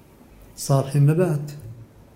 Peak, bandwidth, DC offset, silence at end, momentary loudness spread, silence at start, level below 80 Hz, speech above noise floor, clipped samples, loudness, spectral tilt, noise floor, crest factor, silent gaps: -4 dBFS; 16 kHz; under 0.1%; 0.3 s; 20 LU; 0.6 s; -54 dBFS; 28 dB; under 0.1%; -21 LUFS; -7 dB/octave; -48 dBFS; 18 dB; none